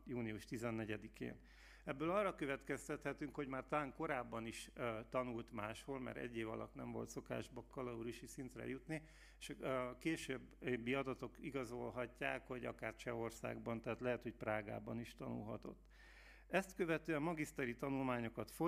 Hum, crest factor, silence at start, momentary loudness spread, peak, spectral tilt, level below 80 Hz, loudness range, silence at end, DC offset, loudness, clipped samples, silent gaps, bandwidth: none; 24 dB; 0 s; 10 LU; -22 dBFS; -5.5 dB/octave; -66 dBFS; 4 LU; 0 s; under 0.1%; -46 LUFS; under 0.1%; none; 15.5 kHz